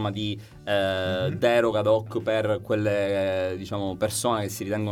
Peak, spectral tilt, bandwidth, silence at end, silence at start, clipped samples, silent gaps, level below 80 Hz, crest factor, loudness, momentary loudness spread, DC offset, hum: -10 dBFS; -5 dB/octave; 17.5 kHz; 0 s; 0 s; under 0.1%; none; -58 dBFS; 16 dB; -25 LUFS; 8 LU; under 0.1%; none